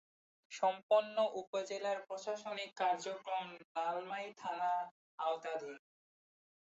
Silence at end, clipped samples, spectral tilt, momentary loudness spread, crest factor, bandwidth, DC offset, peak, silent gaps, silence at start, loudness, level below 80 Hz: 0.95 s; under 0.1%; -1 dB/octave; 11 LU; 20 dB; 8 kHz; under 0.1%; -20 dBFS; 0.83-0.89 s, 1.47-1.53 s, 3.64-3.75 s, 4.91-5.18 s; 0.5 s; -39 LUFS; under -90 dBFS